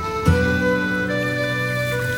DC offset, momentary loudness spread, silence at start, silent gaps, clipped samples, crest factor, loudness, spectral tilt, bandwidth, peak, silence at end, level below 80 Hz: 0.2%; 3 LU; 0 s; none; under 0.1%; 16 dB; -20 LUFS; -6 dB/octave; 18 kHz; -4 dBFS; 0 s; -36 dBFS